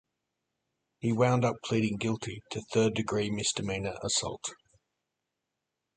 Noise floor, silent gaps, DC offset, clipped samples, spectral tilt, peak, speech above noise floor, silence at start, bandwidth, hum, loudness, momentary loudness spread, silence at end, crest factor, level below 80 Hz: -86 dBFS; none; under 0.1%; under 0.1%; -4.5 dB/octave; -12 dBFS; 56 dB; 1 s; 9.6 kHz; none; -30 LUFS; 11 LU; 1.4 s; 20 dB; -60 dBFS